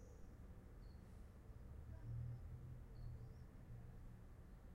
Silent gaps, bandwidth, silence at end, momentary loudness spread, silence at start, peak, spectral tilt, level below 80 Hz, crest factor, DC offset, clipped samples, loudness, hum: none; 16 kHz; 0 s; 10 LU; 0 s; -40 dBFS; -8 dB/octave; -60 dBFS; 14 dB; under 0.1%; under 0.1%; -58 LUFS; none